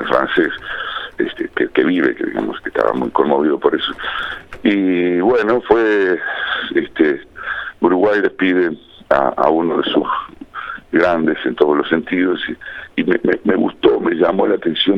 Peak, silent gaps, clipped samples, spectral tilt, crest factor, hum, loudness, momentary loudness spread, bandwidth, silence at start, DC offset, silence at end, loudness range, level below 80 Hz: 0 dBFS; none; under 0.1%; -7 dB/octave; 16 dB; none; -17 LUFS; 10 LU; 6.2 kHz; 0 s; under 0.1%; 0 s; 2 LU; -50 dBFS